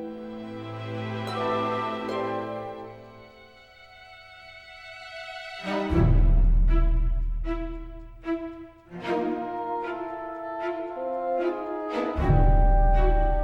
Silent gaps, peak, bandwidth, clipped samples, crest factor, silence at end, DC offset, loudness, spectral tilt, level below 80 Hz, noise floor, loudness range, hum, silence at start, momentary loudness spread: none; -8 dBFS; 5.6 kHz; under 0.1%; 16 dB; 0 s; under 0.1%; -28 LUFS; -8 dB/octave; -26 dBFS; -51 dBFS; 9 LU; none; 0 s; 21 LU